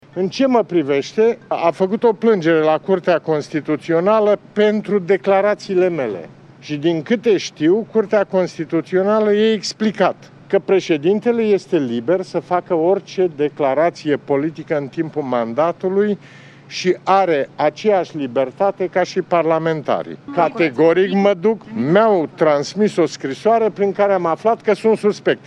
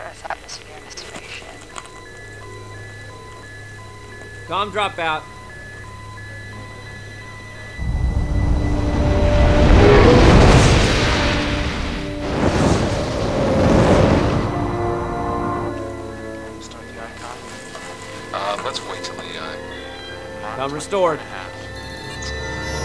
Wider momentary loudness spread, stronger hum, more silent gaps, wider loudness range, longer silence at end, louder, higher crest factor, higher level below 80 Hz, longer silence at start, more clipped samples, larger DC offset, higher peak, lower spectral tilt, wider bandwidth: second, 6 LU vs 22 LU; neither; neither; second, 3 LU vs 16 LU; about the same, 0.1 s vs 0 s; about the same, -17 LUFS vs -18 LUFS; about the same, 16 dB vs 18 dB; second, -66 dBFS vs -26 dBFS; first, 0.15 s vs 0 s; neither; second, under 0.1% vs 0.4%; about the same, 0 dBFS vs -2 dBFS; about the same, -6 dB/octave vs -6 dB/octave; second, 9.8 kHz vs 11 kHz